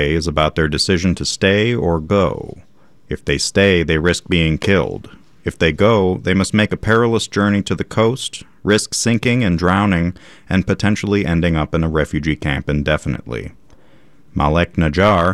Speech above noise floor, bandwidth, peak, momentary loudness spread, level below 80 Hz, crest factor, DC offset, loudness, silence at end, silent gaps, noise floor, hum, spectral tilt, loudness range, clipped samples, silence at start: 35 dB; 13 kHz; -2 dBFS; 11 LU; -36 dBFS; 16 dB; under 0.1%; -16 LUFS; 0 s; none; -51 dBFS; none; -5.5 dB/octave; 3 LU; under 0.1%; 0 s